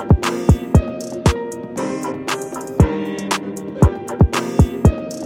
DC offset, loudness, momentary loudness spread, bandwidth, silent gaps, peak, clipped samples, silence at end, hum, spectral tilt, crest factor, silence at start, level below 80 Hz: under 0.1%; -19 LUFS; 10 LU; 16 kHz; none; -2 dBFS; under 0.1%; 0 s; none; -6.5 dB/octave; 16 dB; 0 s; -24 dBFS